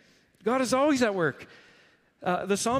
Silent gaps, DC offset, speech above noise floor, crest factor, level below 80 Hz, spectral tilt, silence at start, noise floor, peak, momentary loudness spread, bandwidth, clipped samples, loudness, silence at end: none; under 0.1%; 35 dB; 16 dB; -62 dBFS; -4.5 dB/octave; 0.45 s; -61 dBFS; -12 dBFS; 11 LU; 15.5 kHz; under 0.1%; -27 LUFS; 0 s